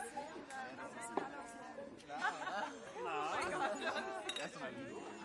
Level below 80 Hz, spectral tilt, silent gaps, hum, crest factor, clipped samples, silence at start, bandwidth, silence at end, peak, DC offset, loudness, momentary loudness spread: -78 dBFS; -3 dB/octave; none; none; 22 dB; under 0.1%; 0 s; 11.5 kHz; 0 s; -22 dBFS; under 0.1%; -43 LUFS; 10 LU